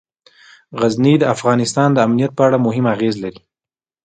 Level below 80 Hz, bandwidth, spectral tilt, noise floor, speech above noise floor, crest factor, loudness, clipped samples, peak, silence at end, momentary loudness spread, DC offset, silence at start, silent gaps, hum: -58 dBFS; 9.4 kHz; -6.5 dB/octave; under -90 dBFS; over 75 dB; 16 dB; -15 LUFS; under 0.1%; 0 dBFS; 0.65 s; 8 LU; under 0.1%; 0.7 s; none; none